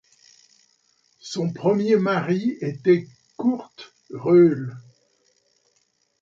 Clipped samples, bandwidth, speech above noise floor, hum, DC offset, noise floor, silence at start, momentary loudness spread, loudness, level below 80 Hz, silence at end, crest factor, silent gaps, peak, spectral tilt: under 0.1%; 7.8 kHz; 48 dB; none; under 0.1%; -68 dBFS; 1.25 s; 21 LU; -21 LUFS; -70 dBFS; 1.4 s; 18 dB; none; -6 dBFS; -7.5 dB/octave